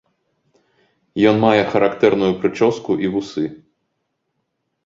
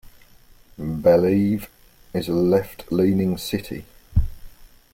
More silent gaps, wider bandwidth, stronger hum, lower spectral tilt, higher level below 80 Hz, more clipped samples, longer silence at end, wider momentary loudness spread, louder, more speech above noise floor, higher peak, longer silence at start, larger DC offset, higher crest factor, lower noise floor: neither; second, 7.6 kHz vs 16.5 kHz; neither; about the same, -6.5 dB/octave vs -7.5 dB/octave; second, -56 dBFS vs -36 dBFS; neither; first, 1.3 s vs 0.3 s; second, 11 LU vs 16 LU; first, -17 LUFS vs -22 LUFS; first, 57 dB vs 30 dB; first, 0 dBFS vs -6 dBFS; first, 1.15 s vs 0.8 s; neither; about the same, 18 dB vs 18 dB; first, -73 dBFS vs -50 dBFS